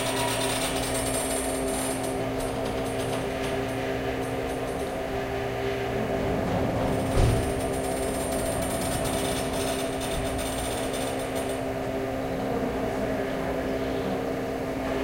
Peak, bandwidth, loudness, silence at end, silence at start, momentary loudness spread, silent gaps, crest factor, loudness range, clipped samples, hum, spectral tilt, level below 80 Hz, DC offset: -10 dBFS; 16 kHz; -28 LUFS; 0 s; 0 s; 4 LU; none; 18 dB; 3 LU; under 0.1%; none; -4.5 dB/octave; -40 dBFS; under 0.1%